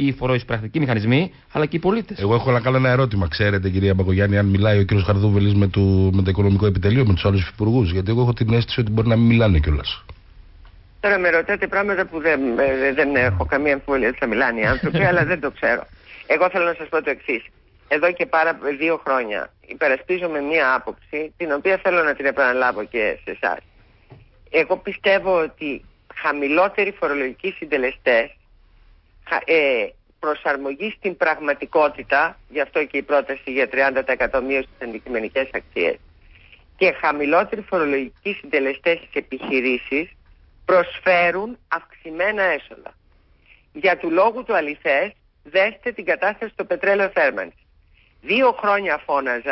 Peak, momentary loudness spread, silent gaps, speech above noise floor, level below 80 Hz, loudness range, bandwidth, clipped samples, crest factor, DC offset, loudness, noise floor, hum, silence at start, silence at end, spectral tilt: -6 dBFS; 9 LU; none; 36 dB; -36 dBFS; 4 LU; 5.8 kHz; under 0.1%; 14 dB; under 0.1%; -20 LUFS; -56 dBFS; none; 0 s; 0 s; -11.5 dB/octave